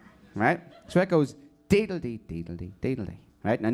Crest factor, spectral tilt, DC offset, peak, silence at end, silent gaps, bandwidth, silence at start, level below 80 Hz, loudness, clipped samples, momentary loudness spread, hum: 20 dB; -7 dB/octave; under 0.1%; -6 dBFS; 0 s; none; 14 kHz; 0.35 s; -52 dBFS; -28 LUFS; under 0.1%; 13 LU; none